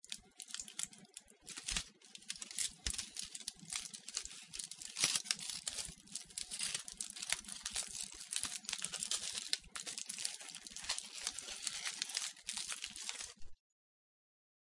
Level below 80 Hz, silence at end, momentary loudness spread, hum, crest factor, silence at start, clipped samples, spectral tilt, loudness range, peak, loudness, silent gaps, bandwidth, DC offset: -64 dBFS; 1.2 s; 9 LU; none; 32 dB; 0.05 s; under 0.1%; 1 dB/octave; 4 LU; -12 dBFS; -41 LUFS; none; 11.5 kHz; under 0.1%